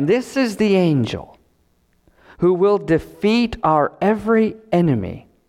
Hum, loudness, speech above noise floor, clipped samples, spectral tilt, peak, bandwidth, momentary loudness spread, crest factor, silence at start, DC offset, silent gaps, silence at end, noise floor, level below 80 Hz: none; -18 LUFS; 44 dB; under 0.1%; -7 dB/octave; -4 dBFS; 14.5 kHz; 5 LU; 14 dB; 0 s; under 0.1%; none; 0.3 s; -61 dBFS; -46 dBFS